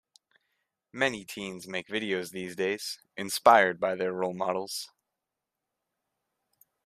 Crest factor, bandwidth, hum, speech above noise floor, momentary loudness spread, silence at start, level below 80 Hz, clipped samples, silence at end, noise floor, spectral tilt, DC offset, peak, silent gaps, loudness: 26 dB; 14.5 kHz; none; 59 dB; 17 LU; 0.95 s; -74 dBFS; under 0.1%; 2 s; -87 dBFS; -3.5 dB/octave; under 0.1%; -6 dBFS; none; -28 LUFS